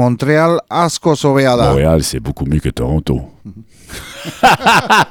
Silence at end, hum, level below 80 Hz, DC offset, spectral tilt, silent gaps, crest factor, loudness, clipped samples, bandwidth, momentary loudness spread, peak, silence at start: 0 s; none; -30 dBFS; under 0.1%; -5 dB/octave; none; 14 dB; -13 LUFS; under 0.1%; over 20 kHz; 17 LU; 0 dBFS; 0 s